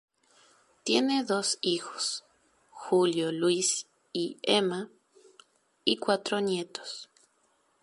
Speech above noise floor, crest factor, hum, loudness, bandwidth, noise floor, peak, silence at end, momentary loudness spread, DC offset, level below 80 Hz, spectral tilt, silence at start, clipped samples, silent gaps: 42 dB; 22 dB; none; -29 LUFS; 11.5 kHz; -70 dBFS; -8 dBFS; 0.8 s; 13 LU; under 0.1%; -78 dBFS; -3 dB/octave; 0.85 s; under 0.1%; none